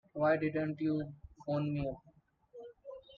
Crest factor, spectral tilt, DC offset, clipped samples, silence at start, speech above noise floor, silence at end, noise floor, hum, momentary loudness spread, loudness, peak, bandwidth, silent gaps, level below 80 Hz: 18 dB; -9.5 dB/octave; under 0.1%; under 0.1%; 0.15 s; 27 dB; 0 s; -61 dBFS; none; 20 LU; -35 LUFS; -18 dBFS; 5.2 kHz; none; -62 dBFS